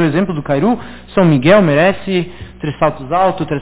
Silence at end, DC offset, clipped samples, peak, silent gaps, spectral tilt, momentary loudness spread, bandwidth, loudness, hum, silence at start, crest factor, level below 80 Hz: 0 s; under 0.1%; under 0.1%; 0 dBFS; none; -11 dB/octave; 12 LU; 4 kHz; -14 LUFS; none; 0 s; 14 dB; -40 dBFS